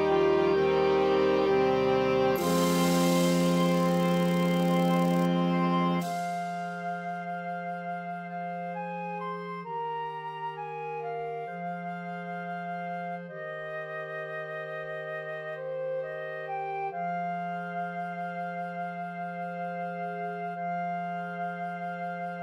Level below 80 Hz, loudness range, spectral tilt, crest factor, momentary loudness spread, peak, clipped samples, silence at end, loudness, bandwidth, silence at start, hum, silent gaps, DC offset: -62 dBFS; 11 LU; -6 dB/octave; 16 dB; 12 LU; -12 dBFS; under 0.1%; 0 s; -30 LUFS; 16 kHz; 0 s; none; none; under 0.1%